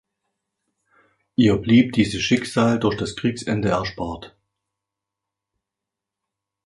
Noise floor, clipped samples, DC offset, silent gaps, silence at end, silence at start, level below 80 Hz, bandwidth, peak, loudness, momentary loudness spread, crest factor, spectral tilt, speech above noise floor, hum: -86 dBFS; under 0.1%; under 0.1%; none; 2.4 s; 1.4 s; -48 dBFS; 11.5 kHz; -4 dBFS; -20 LUFS; 12 LU; 20 dB; -6 dB/octave; 66 dB; none